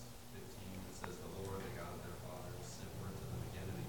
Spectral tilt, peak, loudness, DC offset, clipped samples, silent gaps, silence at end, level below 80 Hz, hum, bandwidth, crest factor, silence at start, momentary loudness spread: -5 dB/octave; -24 dBFS; -49 LUFS; 0.1%; under 0.1%; none; 0 s; -60 dBFS; none; 18 kHz; 22 dB; 0 s; 5 LU